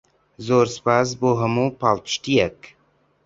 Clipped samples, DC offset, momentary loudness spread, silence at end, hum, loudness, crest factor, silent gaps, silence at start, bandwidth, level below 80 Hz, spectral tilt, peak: under 0.1%; under 0.1%; 4 LU; 0.6 s; none; -20 LUFS; 18 dB; none; 0.4 s; 7.8 kHz; -54 dBFS; -5.5 dB/octave; -2 dBFS